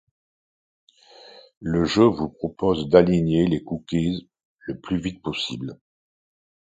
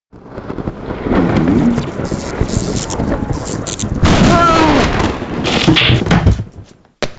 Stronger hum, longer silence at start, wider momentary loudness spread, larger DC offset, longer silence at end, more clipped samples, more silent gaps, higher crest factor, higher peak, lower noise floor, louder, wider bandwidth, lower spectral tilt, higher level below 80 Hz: neither; first, 1.35 s vs 0.15 s; about the same, 17 LU vs 15 LU; neither; first, 0.95 s vs 0.05 s; neither; first, 1.57-1.61 s, 4.45-4.56 s vs none; first, 24 dB vs 14 dB; about the same, 0 dBFS vs 0 dBFS; first, -49 dBFS vs -38 dBFS; second, -22 LUFS vs -14 LUFS; about the same, 9 kHz vs 9.2 kHz; first, -7 dB/octave vs -5.5 dB/octave; second, -48 dBFS vs -24 dBFS